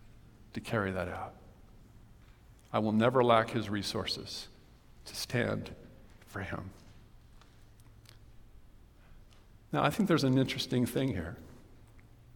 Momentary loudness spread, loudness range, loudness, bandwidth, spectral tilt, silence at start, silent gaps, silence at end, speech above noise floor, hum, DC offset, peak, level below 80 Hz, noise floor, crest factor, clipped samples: 19 LU; 16 LU; -32 LUFS; 18 kHz; -5.5 dB/octave; 0.05 s; none; 0.35 s; 26 dB; none; under 0.1%; -10 dBFS; -58 dBFS; -57 dBFS; 24 dB; under 0.1%